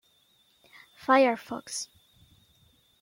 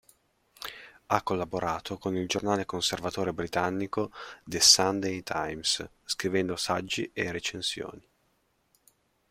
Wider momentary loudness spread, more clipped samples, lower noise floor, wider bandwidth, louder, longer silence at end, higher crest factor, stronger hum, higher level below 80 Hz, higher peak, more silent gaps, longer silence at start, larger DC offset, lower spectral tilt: about the same, 16 LU vs 16 LU; neither; second, -66 dBFS vs -72 dBFS; about the same, 16.5 kHz vs 16 kHz; about the same, -27 LUFS vs -28 LUFS; second, 1.15 s vs 1.3 s; about the same, 22 dB vs 26 dB; neither; second, -74 dBFS vs -62 dBFS; second, -8 dBFS vs -4 dBFS; neither; first, 1.1 s vs 0.6 s; neither; about the same, -2.5 dB/octave vs -2.5 dB/octave